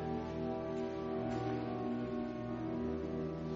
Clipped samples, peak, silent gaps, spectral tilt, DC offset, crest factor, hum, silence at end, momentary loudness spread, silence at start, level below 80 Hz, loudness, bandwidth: under 0.1%; -26 dBFS; none; -7 dB/octave; under 0.1%; 12 dB; none; 0 s; 2 LU; 0 s; -56 dBFS; -40 LUFS; 7.4 kHz